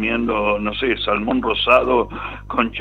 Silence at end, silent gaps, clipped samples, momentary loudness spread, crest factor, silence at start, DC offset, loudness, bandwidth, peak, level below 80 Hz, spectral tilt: 0 s; none; under 0.1%; 9 LU; 18 dB; 0 s; under 0.1%; -18 LUFS; 7.8 kHz; 0 dBFS; -38 dBFS; -6.5 dB/octave